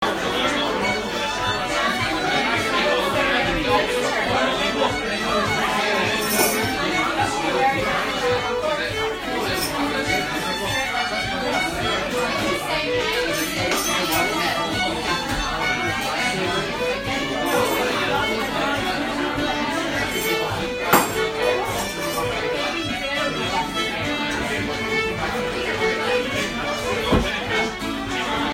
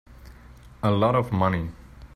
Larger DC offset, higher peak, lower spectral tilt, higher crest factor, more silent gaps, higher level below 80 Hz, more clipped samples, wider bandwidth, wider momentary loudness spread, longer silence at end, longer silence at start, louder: neither; first, 0 dBFS vs -8 dBFS; second, -3 dB/octave vs -8.5 dB/octave; about the same, 22 dB vs 18 dB; neither; about the same, -42 dBFS vs -46 dBFS; neither; first, 16 kHz vs 13.5 kHz; second, 4 LU vs 9 LU; about the same, 0 s vs 0.1 s; about the same, 0 s vs 0.1 s; first, -21 LUFS vs -24 LUFS